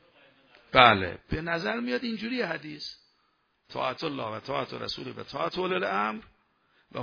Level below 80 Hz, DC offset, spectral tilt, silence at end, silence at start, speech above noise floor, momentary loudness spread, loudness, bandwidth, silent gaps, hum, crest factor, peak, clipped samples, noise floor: -54 dBFS; under 0.1%; -5.5 dB/octave; 0 s; 0.7 s; 43 dB; 19 LU; -28 LUFS; 5.4 kHz; none; none; 28 dB; -2 dBFS; under 0.1%; -71 dBFS